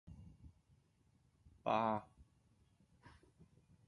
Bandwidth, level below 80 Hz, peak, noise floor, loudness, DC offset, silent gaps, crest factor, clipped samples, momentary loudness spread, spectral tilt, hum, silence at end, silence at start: 11 kHz; -70 dBFS; -22 dBFS; -75 dBFS; -40 LUFS; under 0.1%; none; 24 dB; under 0.1%; 23 LU; -7 dB/octave; none; 0.8 s; 0.05 s